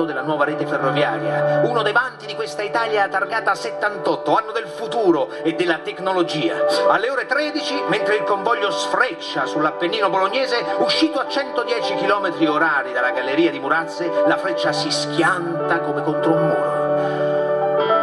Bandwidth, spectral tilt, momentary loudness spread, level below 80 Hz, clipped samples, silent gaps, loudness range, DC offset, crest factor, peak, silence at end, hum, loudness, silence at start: 12 kHz; -4.5 dB/octave; 4 LU; -68 dBFS; under 0.1%; none; 1 LU; under 0.1%; 18 dB; -2 dBFS; 0 s; none; -19 LUFS; 0 s